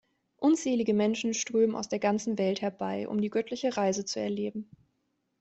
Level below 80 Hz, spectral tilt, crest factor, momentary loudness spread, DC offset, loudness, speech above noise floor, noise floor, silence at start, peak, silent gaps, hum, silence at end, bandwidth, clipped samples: -72 dBFS; -4.5 dB/octave; 16 dB; 6 LU; under 0.1%; -29 LUFS; 49 dB; -77 dBFS; 0.4 s; -14 dBFS; none; none; 0.8 s; 8.2 kHz; under 0.1%